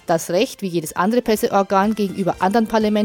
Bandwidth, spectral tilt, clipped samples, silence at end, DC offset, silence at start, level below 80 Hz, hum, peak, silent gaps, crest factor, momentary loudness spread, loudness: 17.5 kHz; -5.5 dB/octave; under 0.1%; 0 s; under 0.1%; 0.1 s; -50 dBFS; none; -2 dBFS; none; 16 dB; 4 LU; -19 LUFS